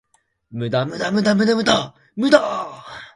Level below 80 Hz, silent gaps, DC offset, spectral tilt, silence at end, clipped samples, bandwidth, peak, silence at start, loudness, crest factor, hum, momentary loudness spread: -56 dBFS; none; under 0.1%; -5 dB/octave; 0.1 s; under 0.1%; 11.5 kHz; 0 dBFS; 0.5 s; -19 LUFS; 20 dB; none; 16 LU